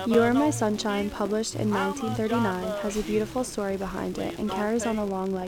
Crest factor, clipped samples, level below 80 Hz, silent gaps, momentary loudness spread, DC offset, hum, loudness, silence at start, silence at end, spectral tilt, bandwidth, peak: 18 dB; under 0.1%; -50 dBFS; none; 7 LU; under 0.1%; none; -27 LUFS; 0 s; 0 s; -5 dB/octave; 18.5 kHz; -8 dBFS